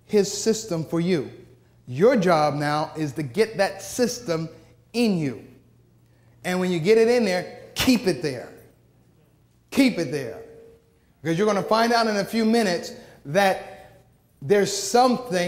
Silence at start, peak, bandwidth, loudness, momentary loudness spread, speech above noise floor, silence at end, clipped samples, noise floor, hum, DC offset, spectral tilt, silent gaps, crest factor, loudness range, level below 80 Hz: 0.1 s; -6 dBFS; 16 kHz; -23 LUFS; 15 LU; 37 dB; 0 s; under 0.1%; -59 dBFS; none; under 0.1%; -5 dB/octave; none; 18 dB; 4 LU; -58 dBFS